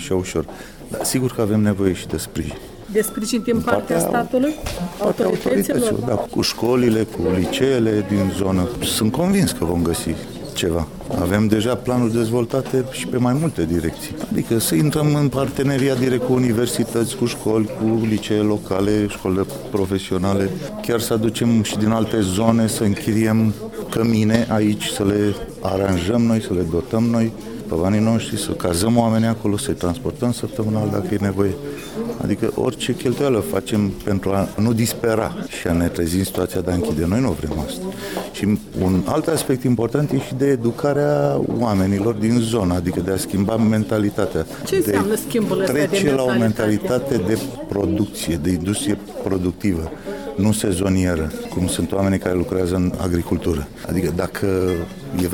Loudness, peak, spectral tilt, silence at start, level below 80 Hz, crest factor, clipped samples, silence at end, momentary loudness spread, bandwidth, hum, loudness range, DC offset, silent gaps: -20 LUFS; -2 dBFS; -6 dB/octave; 0 s; -40 dBFS; 18 dB; under 0.1%; 0 s; 7 LU; 18 kHz; none; 3 LU; under 0.1%; none